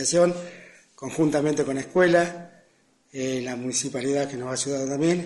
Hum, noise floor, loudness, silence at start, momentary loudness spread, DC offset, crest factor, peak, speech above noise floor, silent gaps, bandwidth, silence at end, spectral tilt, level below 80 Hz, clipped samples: none; -62 dBFS; -24 LUFS; 0 s; 15 LU; under 0.1%; 18 dB; -6 dBFS; 39 dB; none; 11.5 kHz; 0 s; -4.5 dB/octave; -64 dBFS; under 0.1%